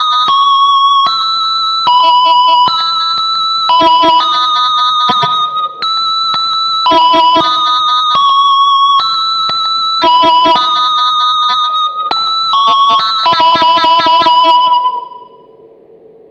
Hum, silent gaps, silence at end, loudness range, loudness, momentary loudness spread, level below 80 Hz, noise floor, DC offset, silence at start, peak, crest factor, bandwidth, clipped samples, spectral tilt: none; none; 1.05 s; 1 LU; -8 LUFS; 4 LU; -54 dBFS; -39 dBFS; under 0.1%; 0 s; 0 dBFS; 10 dB; 8.4 kHz; under 0.1%; -2 dB/octave